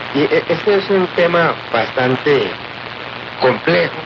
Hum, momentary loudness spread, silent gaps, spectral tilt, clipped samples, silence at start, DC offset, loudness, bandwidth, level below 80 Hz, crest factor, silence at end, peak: none; 13 LU; none; -3.5 dB/octave; under 0.1%; 0 s; under 0.1%; -15 LUFS; 6.8 kHz; -52 dBFS; 14 dB; 0 s; -2 dBFS